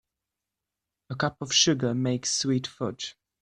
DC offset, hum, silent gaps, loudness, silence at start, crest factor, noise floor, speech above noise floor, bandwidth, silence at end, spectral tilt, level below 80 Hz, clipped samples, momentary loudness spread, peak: under 0.1%; none; none; -26 LUFS; 1.1 s; 20 dB; -87 dBFS; 61 dB; 11 kHz; 0.3 s; -3.5 dB/octave; -64 dBFS; under 0.1%; 15 LU; -8 dBFS